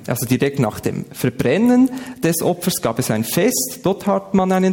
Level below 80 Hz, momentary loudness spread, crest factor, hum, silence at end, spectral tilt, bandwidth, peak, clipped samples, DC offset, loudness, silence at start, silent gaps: -50 dBFS; 7 LU; 14 dB; none; 0 s; -5 dB/octave; 17.5 kHz; -4 dBFS; under 0.1%; under 0.1%; -18 LUFS; 0 s; none